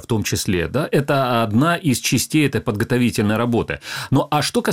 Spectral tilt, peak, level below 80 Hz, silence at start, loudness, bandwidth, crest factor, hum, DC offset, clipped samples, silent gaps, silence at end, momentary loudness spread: -5 dB/octave; -4 dBFS; -44 dBFS; 0 s; -19 LUFS; 16.5 kHz; 16 dB; none; 0.2%; under 0.1%; none; 0 s; 4 LU